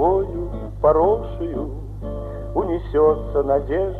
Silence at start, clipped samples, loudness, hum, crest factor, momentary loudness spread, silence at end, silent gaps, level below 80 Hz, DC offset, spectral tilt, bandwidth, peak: 0 s; under 0.1%; -21 LUFS; none; 16 dB; 13 LU; 0 s; none; -32 dBFS; under 0.1%; -10 dB/octave; 4.3 kHz; -4 dBFS